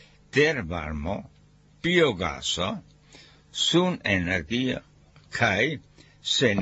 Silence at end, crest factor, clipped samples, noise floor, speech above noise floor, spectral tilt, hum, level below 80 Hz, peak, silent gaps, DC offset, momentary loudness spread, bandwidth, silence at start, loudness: 0 s; 18 dB; under 0.1%; -53 dBFS; 28 dB; -4 dB/octave; none; -48 dBFS; -8 dBFS; none; under 0.1%; 14 LU; 8.2 kHz; 0.35 s; -25 LUFS